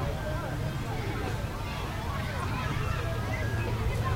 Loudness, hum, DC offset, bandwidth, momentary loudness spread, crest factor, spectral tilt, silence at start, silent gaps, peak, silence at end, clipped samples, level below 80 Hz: -32 LUFS; none; under 0.1%; 16 kHz; 3 LU; 14 dB; -6 dB/octave; 0 s; none; -18 dBFS; 0 s; under 0.1%; -38 dBFS